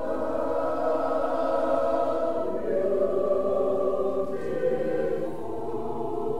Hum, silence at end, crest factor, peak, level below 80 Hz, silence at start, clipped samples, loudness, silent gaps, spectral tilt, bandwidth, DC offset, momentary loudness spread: none; 0 s; 14 dB; -12 dBFS; -56 dBFS; 0 s; under 0.1%; -27 LUFS; none; -7.5 dB/octave; 12.5 kHz; 2%; 7 LU